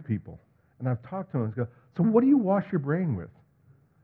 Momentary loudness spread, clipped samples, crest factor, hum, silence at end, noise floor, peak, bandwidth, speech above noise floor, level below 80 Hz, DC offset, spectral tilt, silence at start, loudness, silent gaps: 13 LU; under 0.1%; 18 dB; none; 0.75 s; -61 dBFS; -8 dBFS; 3.7 kHz; 34 dB; -64 dBFS; under 0.1%; -12.5 dB/octave; 0 s; -27 LUFS; none